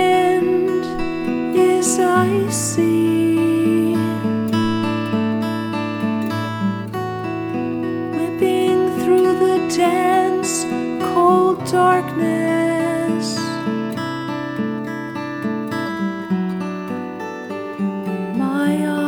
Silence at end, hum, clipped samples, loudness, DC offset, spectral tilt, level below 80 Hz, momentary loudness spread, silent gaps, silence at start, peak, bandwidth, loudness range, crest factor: 0 s; none; under 0.1%; -19 LUFS; under 0.1%; -5.5 dB/octave; -50 dBFS; 9 LU; none; 0 s; -4 dBFS; 19 kHz; 7 LU; 14 dB